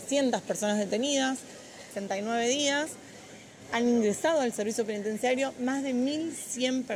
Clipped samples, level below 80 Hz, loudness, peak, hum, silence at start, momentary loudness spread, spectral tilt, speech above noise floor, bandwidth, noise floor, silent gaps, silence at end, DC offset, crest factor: under 0.1%; -72 dBFS; -29 LUFS; -14 dBFS; none; 0 s; 17 LU; -3 dB/octave; 20 dB; 16 kHz; -48 dBFS; none; 0 s; under 0.1%; 16 dB